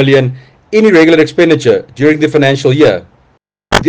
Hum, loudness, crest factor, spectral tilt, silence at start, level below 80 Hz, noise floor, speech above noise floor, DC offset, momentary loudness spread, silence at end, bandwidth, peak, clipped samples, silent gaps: none; -9 LUFS; 10 dB; -6 dB/octave; 0 s; -38 dBFS; -53 dBFS; 45 dB; under 0.1%; 8 LU; 0 s; 10 kHz; 0 dBFS; 0.9%; none